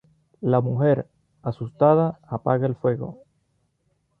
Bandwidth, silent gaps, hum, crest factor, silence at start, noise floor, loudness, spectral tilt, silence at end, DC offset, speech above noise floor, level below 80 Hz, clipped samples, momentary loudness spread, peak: 4.5 kHz; none; none; 18 dB; 0.4 s; -70 dBFS; -23 LUFS; -11.5 dB/octave; 1.05 s; under 0.1%; 48 dB; -60 dBFS; under 0.1%; 14 LU; -6 dBFS